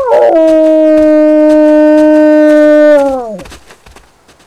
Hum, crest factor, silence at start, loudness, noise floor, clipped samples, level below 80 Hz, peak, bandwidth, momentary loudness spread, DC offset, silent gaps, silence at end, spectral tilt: none; 6 dB; 0 s; -6 LUFS; -41 dBFS; under 0.1%; -42 dBFS; 0 dBFS; 10.5 kHz; 7 LU; under 0.1%; none; 0.9 s; -5.5 dB/octave